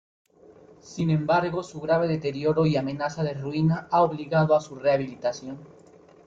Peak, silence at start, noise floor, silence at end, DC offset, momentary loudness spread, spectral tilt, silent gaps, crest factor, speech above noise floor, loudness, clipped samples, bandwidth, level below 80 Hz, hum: -8 dBFS; 0.85 s; -52 dBFS; 0.6 s; under 0.1%; 8 LU; -7.5 dB/octave; none; 16 dB; 28 dB; -25 LUFS; under 0.1%; 7.6 kHz; -60 dBFS; none